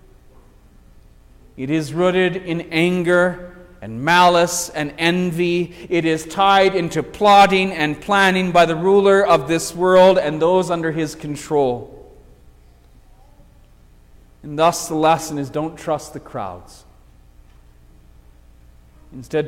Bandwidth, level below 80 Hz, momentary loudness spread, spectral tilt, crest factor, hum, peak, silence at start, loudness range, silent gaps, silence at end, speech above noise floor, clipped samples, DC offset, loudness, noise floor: 16.5 kHz; -48 dBFS; 13 LU; -4.5 dB/octave; 16 dB; none; -2 dBFS; 1.55 s; 13 LU; none; 0 s; 31 dB; under 0.1%; under 0.1%; -17 LUFS; -48 dBFS